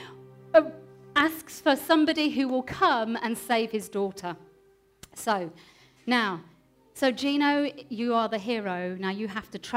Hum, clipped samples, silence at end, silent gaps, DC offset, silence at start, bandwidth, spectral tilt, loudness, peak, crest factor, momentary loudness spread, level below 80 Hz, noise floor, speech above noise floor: none; under 0.1%; 0 s; none; under 0.1%; 0 s; 16 kHz; -4.5 dB/octave; -27 LUFS; -6 dBFS; 22 dB; 15 LU; -66 dBFS; -61 dBFS; 34 dB